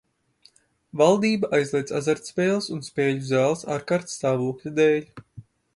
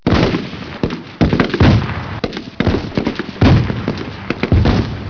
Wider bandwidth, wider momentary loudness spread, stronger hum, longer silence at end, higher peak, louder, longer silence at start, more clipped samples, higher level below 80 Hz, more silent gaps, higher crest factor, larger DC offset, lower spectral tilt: first, 11.5 kHz vs 5.4 kHz; second, 7 LU vs 11 LU; neither; first, 0.35 s vs 0 s; about the same, -4 dBFS vs -2 dBFS; second, -23 LUFS vs -16 LUFS; first, 0.95 s vs 0.05 s; neither; second, -64 dBFS vs -26 dBFS; neither; first, 20 dB vs 14 dB; neither; second, -5.5 dB/octave vs -7.5 dB/octave